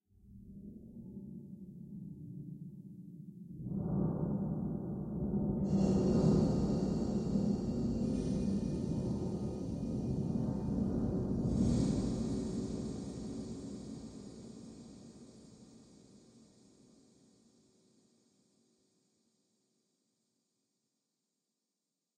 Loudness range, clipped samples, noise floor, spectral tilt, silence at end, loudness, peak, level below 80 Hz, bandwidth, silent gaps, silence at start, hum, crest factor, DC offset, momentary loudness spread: 17 LU; under 0.1%; -89 dBFS; -8.5 dB/octave; 5.8 s; -36 LUFS; -18 dBFS; -52 dBFS; 10 kHz; none; 0.25 s; none; 20 dB; under 0.1%; 20 LU